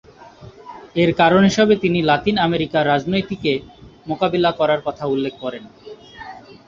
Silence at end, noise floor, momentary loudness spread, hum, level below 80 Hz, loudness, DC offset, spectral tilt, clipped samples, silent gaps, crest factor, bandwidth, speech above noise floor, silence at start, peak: 0.15 s; -42 dBFS; 23 LU; none; -50 dBFS; -18 LUFS; under 0.1%; -6 dB/octave; under 0.1%; none; 18 dB; 7.6 kHz; 24 dB; 0.2 s; -2 dBFS